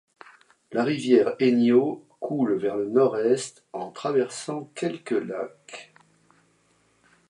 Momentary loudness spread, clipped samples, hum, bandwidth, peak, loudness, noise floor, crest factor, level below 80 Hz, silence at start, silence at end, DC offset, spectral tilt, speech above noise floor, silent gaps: 16 LU; under 0.1%; none; 11 kHz; -6 dBFS; -24 LUFS; -65 dBFS; 20 dB; -76 dBFS; 0.7 s; 1.45 s; under 0.1%; -5.5 dB/octave; 41 dB; none